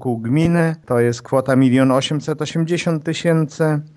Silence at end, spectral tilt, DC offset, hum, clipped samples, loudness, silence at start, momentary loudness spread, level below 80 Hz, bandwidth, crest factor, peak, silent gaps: 0.1 s; -6.5 dB/octave; under 0.1%; none; under 0.1%; -18 LUFS; 0 s; 7 LU; -50 dBFS; 11 kHz; 16 dB; -2 dBFS; none